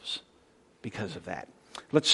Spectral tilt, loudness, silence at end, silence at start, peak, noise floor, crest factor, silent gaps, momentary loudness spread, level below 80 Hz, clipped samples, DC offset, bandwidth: -3.5 dB/octave; -35 LUFS; 0 s; 0.05 s; -8 dBFS; -62 dBFS; 24 dB; none; 17 LU; -68 dBFS; under 0.1%; under 0.1%; 11.5 kHz